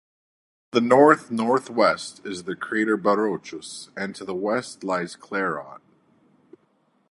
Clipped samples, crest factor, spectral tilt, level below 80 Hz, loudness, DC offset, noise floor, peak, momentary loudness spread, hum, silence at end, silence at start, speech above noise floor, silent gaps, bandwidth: under 0.1%; 22 dB; -5 dB/octave; -70 dBFS; -23 LUFS; under 0.1%; -65 dBFS; -2 dBFS; 17 LU; none; 1.35 s; 0.75 s; 43 dB; none; 11.5 kHz